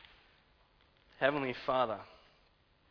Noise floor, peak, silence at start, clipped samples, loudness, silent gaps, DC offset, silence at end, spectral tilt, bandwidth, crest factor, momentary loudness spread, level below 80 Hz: -69 dBFS; -14 dBFS; 1.2 s; under 0.1%; -34 LUFS; none; under 0.1%; 0.75 s; -2.5 dB/octave; 5.4 kHz; 24 dB; 11 LU; -68 dBFS